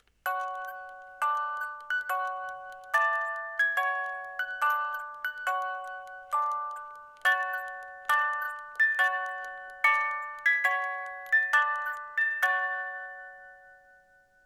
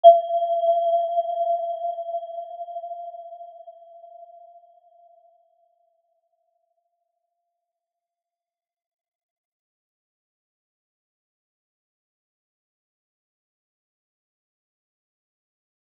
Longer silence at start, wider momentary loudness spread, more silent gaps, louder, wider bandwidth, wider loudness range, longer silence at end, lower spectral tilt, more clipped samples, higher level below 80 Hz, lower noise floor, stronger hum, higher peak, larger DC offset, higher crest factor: first, 0.25 s vs 0.05 s; second, 15 LU vs 25 LU; neither; second, -29 LUFS vs -24 LUFS; first, 18.5 kHz vs 3.5 kHz; second, 5 LU vs 23 LU; second, 0.7 s vs 11.8 s; second, 1.5 dB/octave vs -3 dB/octave; neither; first, -76 dBFS vs under -90 dBFS; second, -62 dBFS vs under -90 dBFS; neither; second, -10 dBFS vs -2 dBFS; neither; second, 20 dB vs 26 dB